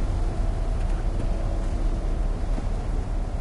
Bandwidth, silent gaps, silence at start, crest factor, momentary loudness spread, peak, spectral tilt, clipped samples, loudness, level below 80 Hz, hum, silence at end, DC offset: 10.5 kHz; none; 0 s; 10 dB; 2 LU; -14 dBFS; -7.5 dB/octave; under 0.1%; -30 LUFS; -24 dBFS; none; 0 s; under 0.1%